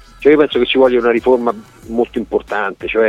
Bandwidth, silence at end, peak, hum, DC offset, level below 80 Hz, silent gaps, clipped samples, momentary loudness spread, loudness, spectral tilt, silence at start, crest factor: 9.2 kHz; 0 s; 0 dBFS; none; under 0.1%; -42 dBFS; none; under 0.1%; 9 LU; -14 LUFS; -6 dB/octave; 0.2 s; 14 dB